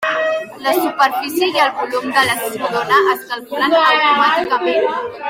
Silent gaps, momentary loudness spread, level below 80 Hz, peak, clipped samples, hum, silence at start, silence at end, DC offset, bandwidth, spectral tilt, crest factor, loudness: none; 8 LU; -60 dBFS; -2 dBFS; under 0.1%; none; 0 s; 0 s; under 0.1%; 16.5 kHz; -2.5 dB/octave; 14 dB; -15 LUFS